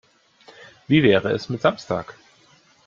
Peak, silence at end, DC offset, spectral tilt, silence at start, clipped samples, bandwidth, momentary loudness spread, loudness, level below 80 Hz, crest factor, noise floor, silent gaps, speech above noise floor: -4 dBFS; 0.75 s; under 0.1%; -7 dB/octave; 0.9 s; under 0.1%; 7.4 kHz; 12 LU; -20 LUFS; -58 dBFS; 20 dB; -56 dBFS; none; 36 dB